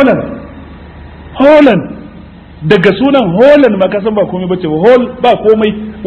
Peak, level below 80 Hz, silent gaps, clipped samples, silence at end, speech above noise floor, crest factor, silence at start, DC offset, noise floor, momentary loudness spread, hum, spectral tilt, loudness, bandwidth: 0 dBFS; -36 dBFS; none; 3%; 0 s; 24 dB; 10 dB; 0 s; under 0.1%; -32 dBFS; 18 LU; none; -8 dB/octave; -8 LUFS; 8.2 kHz